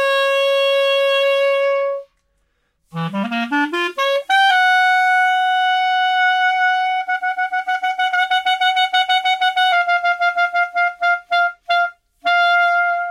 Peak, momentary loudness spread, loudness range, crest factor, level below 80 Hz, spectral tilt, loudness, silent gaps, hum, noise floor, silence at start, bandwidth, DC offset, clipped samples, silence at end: -6 dBFS; 7 LU; 4 LU; 12 dB; -68 dBFS; -3 dB/octave; -16 LUFS; none; none; -66 dBFS; 0 s; 15 kHz; under 0.1%; under 0.1%; 0 s